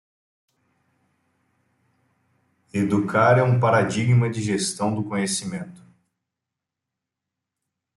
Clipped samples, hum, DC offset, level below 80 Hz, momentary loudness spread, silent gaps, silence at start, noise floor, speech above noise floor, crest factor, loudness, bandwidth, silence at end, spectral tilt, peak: under 0.1%; none; under 0.1%; -62 dBFS; 13 LU; none; 2.75 s; -85 dBFS; 64 dB; 20 dB; -21 LUFS; 12 kHz; 2.2 s; -5.5 dB/octave; -6 dBFS